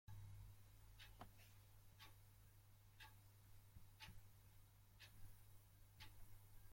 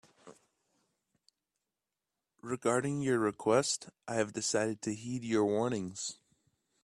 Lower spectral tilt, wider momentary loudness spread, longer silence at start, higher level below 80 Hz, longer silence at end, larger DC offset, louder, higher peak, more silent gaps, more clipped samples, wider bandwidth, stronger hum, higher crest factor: about the same, -3.5 dB/octave vs -4.5 dB/octave; second, 6 LU vs 10 LU; second, 0.05 s vs 0.25 s; about the same, -70 dBFS vs -74 dBFS; second, 0 s vs 0.7 s; neither; second, -66 LUFS vs -33 LUFS; second, -44 dBFS vs -16 dBFS; neither; neither; first, 16.5 kHz vs 13 kHz; neither; about the same, 20 dB vs 20 dB